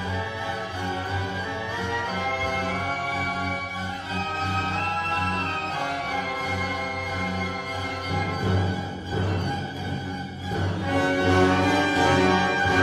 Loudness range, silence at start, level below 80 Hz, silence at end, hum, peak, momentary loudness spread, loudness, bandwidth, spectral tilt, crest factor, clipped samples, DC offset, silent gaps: 4 LU; 0 s; -50 dBFS; 0 s; none; -6 dBFS; 10 LU; -25 LUFS; 13 kHz; -5.5 dB/octave; 18 dB; under 0.1%; under 0.1%; none